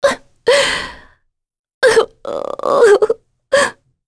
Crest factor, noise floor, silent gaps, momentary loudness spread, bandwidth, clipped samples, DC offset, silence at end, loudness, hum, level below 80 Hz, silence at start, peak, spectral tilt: 16 dB; -57 dBFS; 1.59-1.64 s, 1.74-1.81 s; 13 LU; 11 kHz; under 0.1%; under 0.1%; 0.35 s; -15 LUFS; none; -48 dBFS; 0 s; 0 dBFS; -2 dB/octave